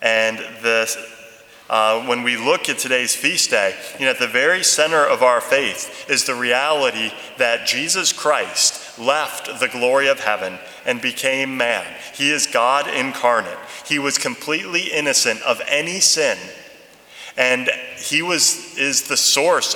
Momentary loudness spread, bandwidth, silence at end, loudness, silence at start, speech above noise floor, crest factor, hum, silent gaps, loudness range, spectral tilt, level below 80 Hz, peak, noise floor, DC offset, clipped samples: 9 LU; over 20 kHz; 0 s; -17 LUFS; 0 s; 25 dB; 20 dB; none; none; 3 LU; -0.5 dB/octave; -70 dBFS; 0 dBFS; -44 dBFS; under 0.1%; under 0.1%